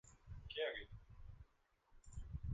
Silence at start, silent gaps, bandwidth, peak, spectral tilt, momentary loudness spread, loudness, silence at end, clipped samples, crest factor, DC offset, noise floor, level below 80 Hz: 0.05 s; none; 9 kHz; -30 dBFS; -5 dB/octave; 19 LU; -49 LUFS; 0 s; under 0.1%; 20 dB; under 0.1%; -76 dBFS; -58 dBFS